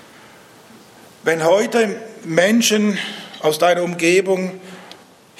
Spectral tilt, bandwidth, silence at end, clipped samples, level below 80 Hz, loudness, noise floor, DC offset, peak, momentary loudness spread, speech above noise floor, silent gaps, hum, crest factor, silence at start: -4 dB/octave; 15.5 kHz; 0.45 s; under 0.1%; -72 dBFS; -17 LUFS; -45 dBFS; under 0.1%; 0 dBFS; 14 LU; 28 dB; none; none; 18 dB; 1.25 s